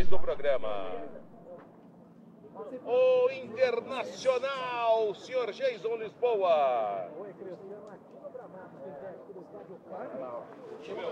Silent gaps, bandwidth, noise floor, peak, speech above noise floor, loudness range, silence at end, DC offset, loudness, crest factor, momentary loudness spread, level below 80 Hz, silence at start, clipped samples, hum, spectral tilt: none; 8.8 kHz; -54 dBFS; -10 dBFS; 26 dB; 15 LU; 0 s; under 0.1%; -31 LUFS; 18 dB; 21 LU; -56 dBFS; 0 s; under 0.1%; none; -5 dB/octave